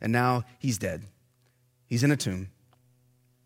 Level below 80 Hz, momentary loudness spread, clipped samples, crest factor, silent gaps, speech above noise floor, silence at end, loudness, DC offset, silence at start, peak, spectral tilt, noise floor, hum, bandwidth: -62 dBFS; 13 LU; under 0.1%; 20 dB; none; 40 dB; 0.95 s; -28 LUFS; under 0.1%; 0 s; -10 dBFS; -5.5 dB/octave; -67 dBFS; none; 16.5 kHz